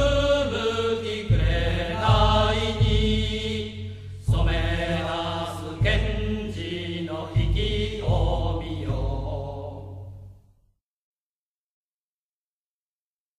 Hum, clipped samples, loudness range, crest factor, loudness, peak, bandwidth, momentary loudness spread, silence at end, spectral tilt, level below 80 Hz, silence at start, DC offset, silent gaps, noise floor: none; under 0.1%; 12 LU; 18 dB; -25 LUFS; -8 dBFS; 11 kHz; 11 LU; 3.05 s; -6 dB/octave; -30 dBFS; 0 s; under 0.1%; none; under -90 dBFS